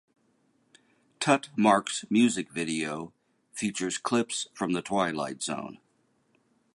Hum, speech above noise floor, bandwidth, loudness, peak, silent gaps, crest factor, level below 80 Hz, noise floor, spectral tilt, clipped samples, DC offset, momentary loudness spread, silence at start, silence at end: none; 42 dB; 11.5 kHz; -28 LUFS; -8 dBFS; none; 22 dB; -70 dBFS; -70 dBFS; -4 dB/octave; under 0.1%; under 0.1%; 12 LU; 1.2 s; 1 s